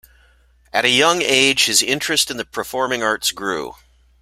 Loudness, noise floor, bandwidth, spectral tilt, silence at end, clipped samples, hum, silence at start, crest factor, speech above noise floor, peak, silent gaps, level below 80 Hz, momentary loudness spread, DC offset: -17 LUFS; -54 dBFS; 16 kHz; -1 dB/octave; 0.5 s; under 0.1%; none; 0.75 s; 20 dB; 36 dB; 0 dBFS; none; -54 dBFS; 12 LU; under 0.1%